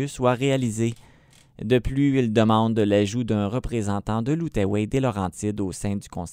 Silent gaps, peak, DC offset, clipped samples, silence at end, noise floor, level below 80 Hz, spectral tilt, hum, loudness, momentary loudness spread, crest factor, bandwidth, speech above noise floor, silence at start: none; -6 dBFS; under 0.1%; under 0.1%; 0 s; -54 dBFS; -42 dBFS; -6.5 dB/octave; none; -23 LUFS; 8 LU; 18 dB; 15.5 kHz; 31 dB; 0 s